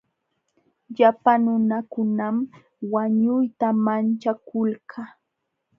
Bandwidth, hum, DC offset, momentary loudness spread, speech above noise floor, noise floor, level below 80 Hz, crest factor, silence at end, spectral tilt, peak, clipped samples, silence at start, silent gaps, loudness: 5.6 kHz; none; under 0.1%; 16 LU; 57 dB; -78 dBFS; -74 dBFS; 20 dB; 0.7 s; -9 dB/octave; -2 dBFS; under 0.1%; 0.9 s; none; -22 LUFS